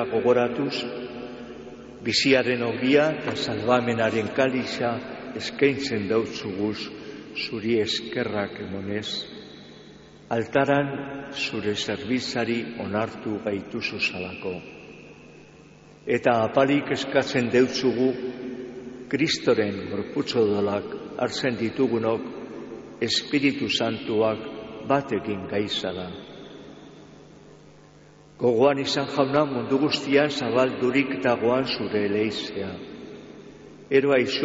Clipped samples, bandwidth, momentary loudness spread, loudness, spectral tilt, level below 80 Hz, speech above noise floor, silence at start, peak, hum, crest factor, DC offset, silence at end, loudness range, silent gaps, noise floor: under 0.1%; 8 kHz; 17 LU; -25 LUFS; -3.5 dB/octave; -60 dBFS; 27 dB; 0 s; -6 dBFS; none; 18 dB; under 0.1%; 0 s; 6 LU; none; -51 dBFS